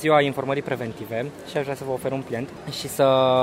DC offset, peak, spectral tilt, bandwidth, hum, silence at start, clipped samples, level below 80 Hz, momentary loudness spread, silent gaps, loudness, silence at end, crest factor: under 0.1%; -6 dBFS; -5.5 dB/octave; 16 kHz; none; 0 s; under 0.1%; -58 dBFS; 12 LU; none; -25 LUFS; 0 s; 18 dB